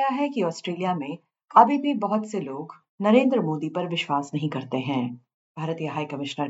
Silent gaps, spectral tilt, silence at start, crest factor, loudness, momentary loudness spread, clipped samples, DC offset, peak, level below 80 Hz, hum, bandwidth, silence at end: 2.89-2.98 s, 5.34-5.55 s; -6.5 dB/octave; 0 s; 22 dB; -25 LUFS; 16 LU; under 0.1%; under 0.1%; -2 dBFS; -82 dBFS; none; 8 kHz; 0 s